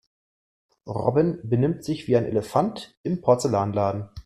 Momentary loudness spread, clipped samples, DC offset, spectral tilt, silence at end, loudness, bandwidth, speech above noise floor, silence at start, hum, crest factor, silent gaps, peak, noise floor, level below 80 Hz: 8 LU; under 0.1%; under 0.1%; -7.5 dB/octave; 0.05 s; -24 LUFS; 14 kHz; over 67 dB; 0.85 s; none; 18 dB; 2.97-3.04 s; -6 dBFS; under -90 dBFS; -54 dBFS